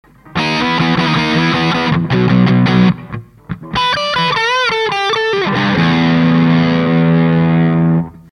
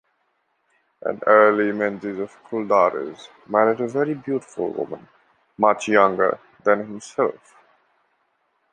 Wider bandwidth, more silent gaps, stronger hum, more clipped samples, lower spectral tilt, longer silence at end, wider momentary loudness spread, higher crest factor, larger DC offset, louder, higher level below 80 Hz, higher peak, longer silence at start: about the same, 9.8 kHz vs 9.6 kHz; neither; neither; neither; about the same, -6.5 dB/octave vs -5.5 dB/octave; second, 0.15 s vs 1.4 s; second, 7 LU vs 14 LU; second, 12 dB vs 20 dB; neither; first, -13 LUFS vs -21 LUFS; first, -40 dBFS vs -70 dBFS; about the same, 0 dBFS vs -2 dBFS; second, 0.35 s vs 1.05 s